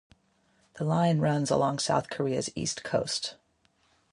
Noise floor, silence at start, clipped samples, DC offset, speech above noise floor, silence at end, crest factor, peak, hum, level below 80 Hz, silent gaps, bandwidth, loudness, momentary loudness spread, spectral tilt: -69 dBFS; 0.75 s; under 0.1%; under 0.1%; 41 dB; 0.8 s; 18 dB; -12 dBFS; none; -62 dBFS; none; 11.5 kHz; -28 LUFS; 7 LU; -5 dB/octave